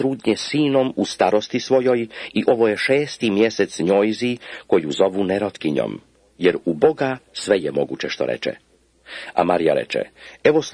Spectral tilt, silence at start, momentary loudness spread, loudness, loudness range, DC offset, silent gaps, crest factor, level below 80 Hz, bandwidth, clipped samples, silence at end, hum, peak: -5 dB/octave; 0 s; 9 LU; -20 LUFS; 3 LU; under 0.1%; none; 18 dB; -60 dBFS; 10.5 kHz; under 0.1%; 0 s; none; -2 dBFS